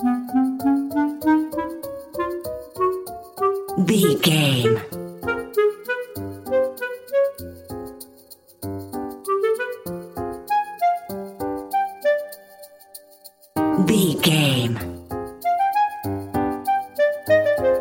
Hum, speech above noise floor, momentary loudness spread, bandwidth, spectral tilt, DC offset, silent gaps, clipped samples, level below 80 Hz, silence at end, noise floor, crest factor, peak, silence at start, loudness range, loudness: none; 30 dB; 16 LU; 17 kHz; -5.5 dB/octave; under 0.1%; none; under 0.1%; -52 dBFS; 0 s; -48 dBFS; 18 dB; -4 dBFS; 0 s; 6 LU; -22 LUFS